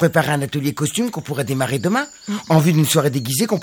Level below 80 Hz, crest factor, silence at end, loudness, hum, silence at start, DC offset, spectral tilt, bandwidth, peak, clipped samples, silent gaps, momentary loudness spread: -56 dBFS; 18 dB; 0 s; -19 LUFS; none; 0 s; under 0.1%; -5 dB/octave; 19 kHz; 0 dBFS; under 0.1%; none; 8 LU